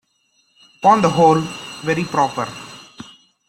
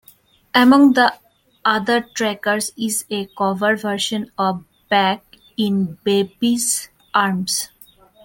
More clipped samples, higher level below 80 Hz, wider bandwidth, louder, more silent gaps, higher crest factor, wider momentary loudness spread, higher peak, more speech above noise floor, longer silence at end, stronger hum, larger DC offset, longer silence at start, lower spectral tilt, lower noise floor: neither; first, -56 dBFS vs -62 dBFS; about the same, 16 kHz vs 17 kHz; about the same, -17 LUFS vs -18 LUFS; neither; about the same, 18 dB vs 18 dB; first, 23 LU vs 10 LU; about the same, -2 dBFS vs -2 dBFS; first, 47 dB vs 34 dB; second, 0.45 s vs 0.6 s; neither; neither; first, 0.8 s vs 0.55 s; first, -5.5 dB/octave vs -3.5 dB/octave; first, -63 dBFS vs -52 dBFS